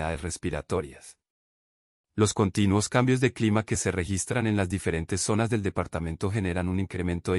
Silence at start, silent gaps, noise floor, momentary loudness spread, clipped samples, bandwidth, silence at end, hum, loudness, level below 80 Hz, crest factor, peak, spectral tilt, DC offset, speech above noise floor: 0 s; 1.30-2.04 s; under -90 dBFS; 8 LU; under 0.1%; 12 kHz; 0 s; none; -27 LUFS; -48 dBFS; 18 dB; -10 dBFS; -5.5 dB/octave; under 0.1%; over 64 dB